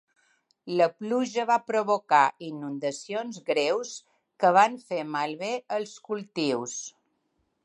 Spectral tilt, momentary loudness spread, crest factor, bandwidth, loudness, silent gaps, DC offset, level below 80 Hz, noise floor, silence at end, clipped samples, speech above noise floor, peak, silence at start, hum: -4 dB/octave; 13 LU; 20 dB; 11.5 kHz; -27 LUFS; none; under 0.1%; -84 dBFS; -74 dBFS; 0.75 s; under 0.1%; 48 dB; -8 dBFS; 0.65 s; none